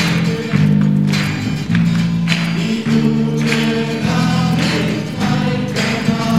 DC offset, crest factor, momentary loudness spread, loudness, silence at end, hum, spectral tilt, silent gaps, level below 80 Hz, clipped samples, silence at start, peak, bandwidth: 0.6%; 16 dB; 4 LU; -16 LUFS; 0 s; none; -6 dB/octave; none; -42 dBFS; under 0.1%; 0 s; 0 dBFS; 15 kHz